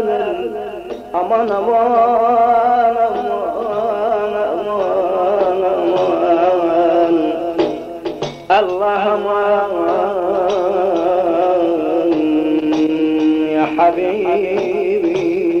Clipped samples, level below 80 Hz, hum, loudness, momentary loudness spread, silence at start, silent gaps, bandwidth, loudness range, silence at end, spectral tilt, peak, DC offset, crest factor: under 0.1%; -52 dBFS; none; -16 LUFS; 7 LU; 0 s; none; 7 kHz; 2 LU; 0 s; -6.5 dB/octave; -2 dBFS; under 0.1%; 12 dB